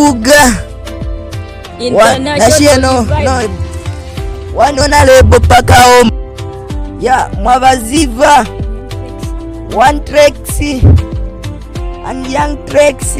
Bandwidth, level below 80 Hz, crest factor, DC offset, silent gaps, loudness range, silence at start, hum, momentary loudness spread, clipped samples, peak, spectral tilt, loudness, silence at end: 16.5 kHz; -20 dBFS; 10 dB; 0.6%; none; 4 LU; 0 s; none; 18 LU; 0.7%; 0 dBFS; -4.5 dB/octave; -8 LUFS; 0 s